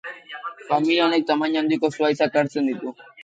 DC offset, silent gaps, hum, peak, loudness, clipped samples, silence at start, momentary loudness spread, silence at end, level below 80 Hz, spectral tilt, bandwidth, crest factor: under 0.1%; none; none; -6 dBFS; -21 LUFS; under 0.1%; 0.05 s; 15 LU; 0 s; -74 dBFS; -5.5 dB/octave; 8.6 kHz; 16 dB